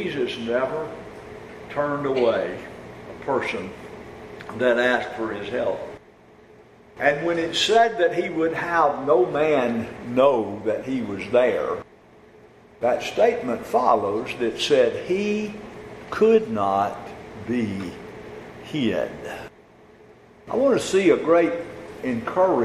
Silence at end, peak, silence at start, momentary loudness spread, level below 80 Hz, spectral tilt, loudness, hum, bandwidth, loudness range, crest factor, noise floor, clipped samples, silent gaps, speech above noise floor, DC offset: 0 s; -4 dBFS; 0 s; 20 LU; -56 dBFS; -5 dB/octave; -22 LUFS; none; 14 kHz; 6 LU; 20 dB; -50 dBFS; under 0.1%; none; 29 dB; under 0.1%